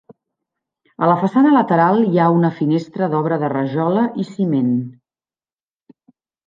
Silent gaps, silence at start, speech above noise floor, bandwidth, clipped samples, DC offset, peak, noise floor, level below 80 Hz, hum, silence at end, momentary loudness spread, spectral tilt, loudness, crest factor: none; 1 s; over 74 dB; 7.4 kHz; under 0.1%; under 0.1%; -2 dBFS; under -90 dBFS; -66 dBFS; none; 1.55 s; 7 LU; -9.5 dB/octave; -17 LUFS; 16 dB